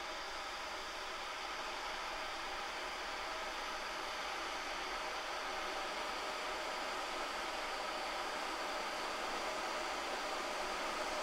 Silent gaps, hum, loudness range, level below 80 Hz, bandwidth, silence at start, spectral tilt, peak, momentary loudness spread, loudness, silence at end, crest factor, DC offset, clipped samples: none; none; 2 LU; -62 dBFS; 16 kHz; 0 s; -1 dB/octave; -26 dBFS; 3 LU; -40 LUFS; 0 s; 14 dB; under 0.1%; under 0.1%